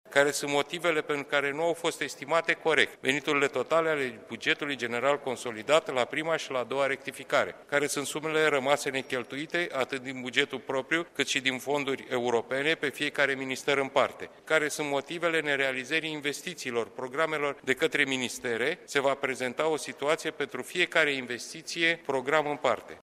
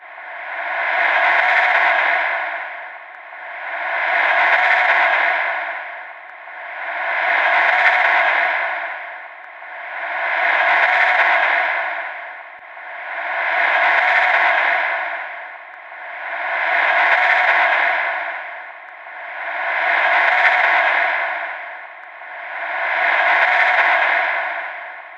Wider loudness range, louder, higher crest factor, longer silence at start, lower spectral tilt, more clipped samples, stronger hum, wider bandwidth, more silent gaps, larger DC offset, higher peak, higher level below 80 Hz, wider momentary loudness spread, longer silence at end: about the same, 2 LU vs 1 LU; second, -28 LUFS vs -16 LUFS; about the same, 22 dB vs 18 dB; about the same, 0.05 s vs 0 s; first, -3 dB/octave vs 1 dB/octave; neither; neither; first, 15 kHz vs 8.4 kHz; neither; neither; second, -8 dBFS vs 0 dBFS; first, -74 dBFS vs under -90 dBFS; second, 7 LU vs 19 LU; about the same, 0.05 s vs 0 s